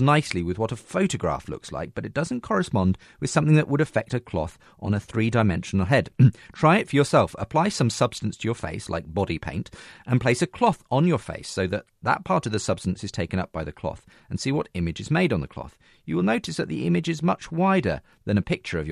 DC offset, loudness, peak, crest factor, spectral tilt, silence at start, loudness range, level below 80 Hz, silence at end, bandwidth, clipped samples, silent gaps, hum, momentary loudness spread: under 0.1%; -25 LUFS; -4 dBFS; 20 dB; -6 dB/octave; 0 s; 6 LU; -48 dBFS; 0 s; 12 kHz; under 0.1%; none; none; 12 LU